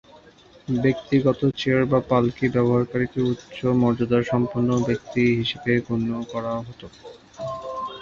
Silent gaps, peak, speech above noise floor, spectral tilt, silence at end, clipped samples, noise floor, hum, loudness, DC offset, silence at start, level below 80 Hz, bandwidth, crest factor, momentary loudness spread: none; -4 dBFS; 29 dB; -7.5 dB/octave; 0 s; under 0.1%; -51 dBFS; none; -23 LUFS; under 0.1%; 0.7 s; -52 dBFS; 7.4 kHz; 18 dB; 11 LU